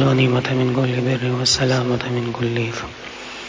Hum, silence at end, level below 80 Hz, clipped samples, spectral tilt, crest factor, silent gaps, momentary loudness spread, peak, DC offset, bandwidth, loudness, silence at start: none; 0 s; -46 dBFS; under 0.1%; -5 dB/octave; 14 dB; none; 13 LU; -4 dBFS; under 0.1%; 8 kHz; -19 LUFS; 0 s